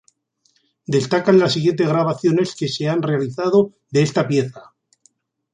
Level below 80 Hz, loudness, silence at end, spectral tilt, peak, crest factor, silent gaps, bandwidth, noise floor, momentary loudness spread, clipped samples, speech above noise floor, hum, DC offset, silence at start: -60 dBFS; -18 LUFS; 0.95 s; -6 dB/octave; -2 dBFS; 16 dB; none; 9.8 kHz; -64 dBFS; 7 LU; under 0.1%; 46 dB; none; under 0.1%; 0.9 s